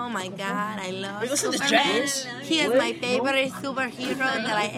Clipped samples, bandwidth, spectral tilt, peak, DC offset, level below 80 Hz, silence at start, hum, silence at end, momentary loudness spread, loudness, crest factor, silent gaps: under 0.1%; 16 kHz; -2.5 dB/octave; -6 dBFS; under 0.1%; -68 dBFS; 0 s; none; 0 s; 9 LU; -24 LUFS; 18 dB; none